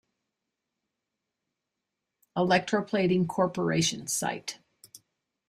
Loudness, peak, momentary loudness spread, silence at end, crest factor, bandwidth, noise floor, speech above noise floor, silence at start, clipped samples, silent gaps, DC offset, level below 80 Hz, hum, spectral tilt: -27 LUFS; -10 dBFS; 12 LU; 0.5 s; 22 dB; 15.5 kHz; -86 dBFS; 59 dB; 2.35 s; under 0.1%; none; under 0.1%; -66 dBFS; none; -4.5 dB/octave